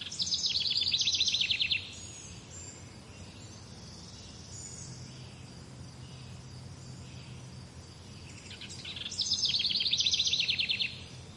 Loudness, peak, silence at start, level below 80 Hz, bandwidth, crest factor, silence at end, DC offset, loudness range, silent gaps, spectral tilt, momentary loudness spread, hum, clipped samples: -28 LUFS; -16 dBFS; 0 s; -62 dBFS; 11.5 kHz; 20 dB; 0 s; under 0.1%; 17 LU; none; -1 dB/octave; 22 LU; none; under 0.1%